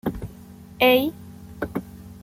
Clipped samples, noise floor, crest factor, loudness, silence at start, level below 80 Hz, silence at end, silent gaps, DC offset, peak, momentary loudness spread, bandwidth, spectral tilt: under 0.1%; -43 dBFS; 20 dB; -23 LUFS; 0.05 s; -48 dBFS; 0.05 s; none; under 0.1%; -4 dBFS; 25 LU; 16.5 kHz; -5.5 dB/octave